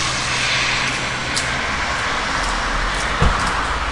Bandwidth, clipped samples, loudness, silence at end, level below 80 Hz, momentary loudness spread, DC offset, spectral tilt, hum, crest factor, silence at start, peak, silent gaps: 11.5 kHz; under 0.1%; -19 LUFS; 0 s; -28 dBFS; 4 LU; 0.5%; -2.5 dB/octave; none; 18 dB; 0 s; -2 dBFS; none